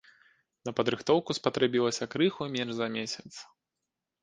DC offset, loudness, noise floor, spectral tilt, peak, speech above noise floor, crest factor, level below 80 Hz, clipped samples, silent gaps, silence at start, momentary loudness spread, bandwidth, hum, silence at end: under 0.1%; -30 LUFS; -87 dBFS; -4.5 dB/octave; -8 dBFS; 57 dB; 22 dB; -70 dBFS; under 0.1%; none; 0.65 s; 13 LU; 10 kHz; none; 0.8 s